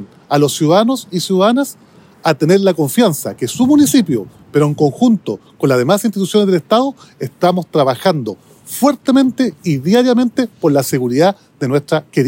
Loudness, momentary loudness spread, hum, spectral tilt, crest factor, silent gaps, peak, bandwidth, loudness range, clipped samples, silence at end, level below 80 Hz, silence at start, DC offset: -14 LUFS; 9 LU; none; -5.5 dB/octave; 14 dB; none; 0 dBFS; 16.5 kHz; 2 LU; under 0.1%; 0 s; -60 dBFS; 0 s; under 0.1%